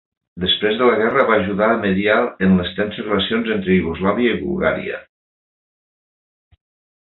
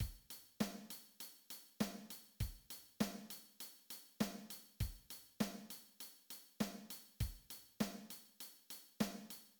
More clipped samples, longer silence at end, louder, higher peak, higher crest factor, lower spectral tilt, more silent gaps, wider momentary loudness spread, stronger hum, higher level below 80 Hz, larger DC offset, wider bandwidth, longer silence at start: neither; first, 2 s vs 0.05 s; first, -17 LUFS vs -48 LUFS; first, -2 dBFS vs -24 dBFS; second, 18 dB vs 24 dB; first, -9.5 dB/octave vs -4.5 dB/octave; neither; second, 8 LU vs 11 LU; neither; first, -44 dBFS vs -58 dBFS; neither; second, 4.3 kHz vs 19.5 kHz; first, 0.35 s vs 0 s